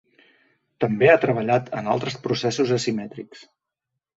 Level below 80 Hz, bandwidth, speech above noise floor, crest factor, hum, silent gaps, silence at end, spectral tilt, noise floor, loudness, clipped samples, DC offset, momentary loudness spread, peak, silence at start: -62 dBFS; 8 kHz; 61 dB; 20 dB; none; none; 0.8 s; -5.5 dB/octave; -83 dBFS; -22 LUFS; under 0.1%; under 0.1%; 16 LU; -2 dBFS; 0.8 s